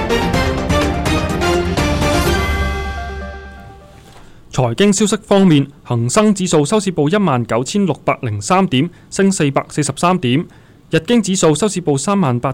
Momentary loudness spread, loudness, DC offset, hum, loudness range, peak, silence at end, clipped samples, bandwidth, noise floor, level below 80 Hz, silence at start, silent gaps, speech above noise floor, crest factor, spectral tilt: 8 LU; -15 LUFS; under 0.1%; none; 4 LU; -4 dBFS; 0 s; under 0.1%; 16 kHz; -39 dBFS; -28 dBFS; 0 s; none; 25 dB; 12 dB; -5 dB/octave